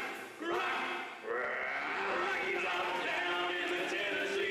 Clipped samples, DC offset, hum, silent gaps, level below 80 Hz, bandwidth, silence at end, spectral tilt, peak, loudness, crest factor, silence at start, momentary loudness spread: under 0.1%; under 0.1%; none; none; -74 dBFS; 15 kHz; 0 s; -2.5 dB/octave; -24 dBFS; -34 LUFS; 12 dB; 0 s; 5 LU